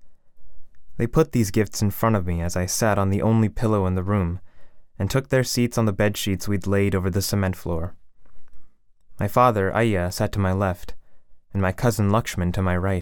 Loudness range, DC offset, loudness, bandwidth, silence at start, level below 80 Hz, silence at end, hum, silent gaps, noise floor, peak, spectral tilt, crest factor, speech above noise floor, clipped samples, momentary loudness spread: 2 LU; under 0.1%; -23 LUFS; 18.5 kHz; 0 s; -40 dBFS; 0 s; none; none; -44 dBFS; -4 dBFS; -6 dB/octave; 18 dB; 22 dB; under 0.1%; 9 LU